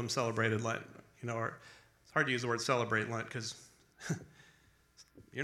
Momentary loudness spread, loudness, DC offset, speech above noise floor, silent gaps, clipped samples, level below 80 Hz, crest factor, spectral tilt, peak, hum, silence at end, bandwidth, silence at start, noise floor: 15 LU; -36 LUFS; under 0.1%; 31 dB; none; under 0.1%; -74 dBFS; 22 dB; -4.5 dB/octave; -16 dBFS; none; 0 s; 14 kHz; 0 s; -67 dBFS